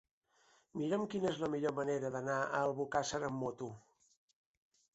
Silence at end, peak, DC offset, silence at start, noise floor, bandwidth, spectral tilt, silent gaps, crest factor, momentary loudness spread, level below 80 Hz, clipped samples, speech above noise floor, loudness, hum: 1.15 s; -20 dBFS; under 0.1%; 0.75 s; -72 dBFS; 8 kHz; -5 dB/octave; none; 20 dB; 10 LU; -72 dBFS; under 0.1%; 34 dB; -38 LUFS; none